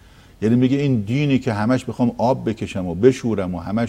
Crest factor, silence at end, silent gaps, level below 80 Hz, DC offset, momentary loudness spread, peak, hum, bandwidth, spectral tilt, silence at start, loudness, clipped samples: 18 dB; 0 s; none; -48 dBFS; under 0.1%; 8 LU; 0 dBFS; none; 10.5 kHz; -7.5 dB/octave; 0.4 s; -20 LUFS; under 0.1%